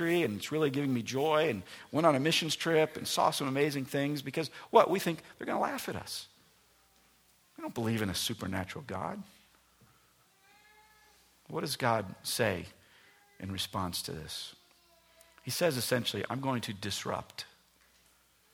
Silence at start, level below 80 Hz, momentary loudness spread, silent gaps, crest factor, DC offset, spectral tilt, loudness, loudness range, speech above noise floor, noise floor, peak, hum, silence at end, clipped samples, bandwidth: 0 s; -68 dBFS; 13 LU; none; 26 dB; under 0.1%; -4.5 dB/octave; -32 LUFS; 9 LU; 35 dB; -67 dBFS; -8 dBFS; none; 1.1 s; under 0.1%; over 20 kHz